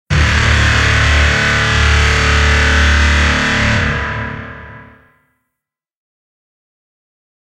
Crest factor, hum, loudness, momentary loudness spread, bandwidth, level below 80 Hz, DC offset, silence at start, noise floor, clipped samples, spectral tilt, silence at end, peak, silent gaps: 14 dB; none; -12 LUFS; 11 LU; 10.5 kHz; -18 dBFS; under 0.1%; 0.1 s; -80 dBFS; under 0.1%; -4 dB/octave; 2.6 s; 0 dBFS; none